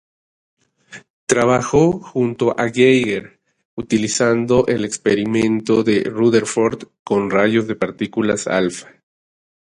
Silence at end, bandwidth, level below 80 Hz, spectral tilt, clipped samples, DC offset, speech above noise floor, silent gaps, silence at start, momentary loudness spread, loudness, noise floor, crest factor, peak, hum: 0.8 s; 11 kHz; -50 dBFS; -5 dB/octave; under 0.1%; under 0.1%; 26 dB; 1.10-1.27 s, 3.65-3.77 s, 6.99-7.05 s; 0.9 s; 8 LU; -17 LUFS; -42 dBFS; 18 dB; 0 dBFS; none